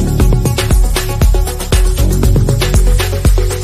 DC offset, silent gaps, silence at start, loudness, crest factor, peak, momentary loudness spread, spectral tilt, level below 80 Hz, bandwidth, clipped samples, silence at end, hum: under 0.1%; none; 0 s; -13 LUFS; 10 dB; 0 dBFS; 2 LU; -5.5 dB/octave; -12 dBFS; 15.5 kHz; under 0.1%; 0 s; none